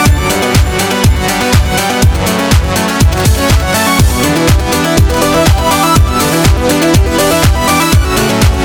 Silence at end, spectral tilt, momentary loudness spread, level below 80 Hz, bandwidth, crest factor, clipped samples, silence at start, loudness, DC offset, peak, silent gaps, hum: 0 s; -4.5 dB/octave; 2 LU; -16 dBFS; 19.5 kHz; 8 dB; under 0.1%; 0 s; -10 LUFS; under 0.1%; 0 dBFS; none; none